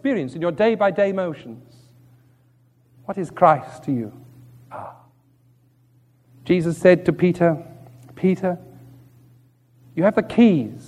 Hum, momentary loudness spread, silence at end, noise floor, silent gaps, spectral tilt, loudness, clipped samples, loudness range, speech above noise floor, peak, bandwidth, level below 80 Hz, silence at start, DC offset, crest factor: none; 21 LU; 0.05 s; -58 dBFS; none; -8 dB/octave; -20 LUFS; under 0.1%; 4 LU; 39 dB; -2 dBFS; 12 kHz; -60 dBFS; 0.05 s; under 0.1%; 20 dB